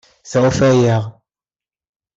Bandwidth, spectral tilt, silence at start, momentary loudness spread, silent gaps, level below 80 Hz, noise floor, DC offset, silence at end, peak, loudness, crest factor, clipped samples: 7.8 kHz; -6.5 dB/octave; 0.25 s; 9 LU; none; -46 dBFS; under -90 dBFS; under 0.1%; 1.05 s; -2 dBFS; -15 LUFS; 14 dB; under 0.1%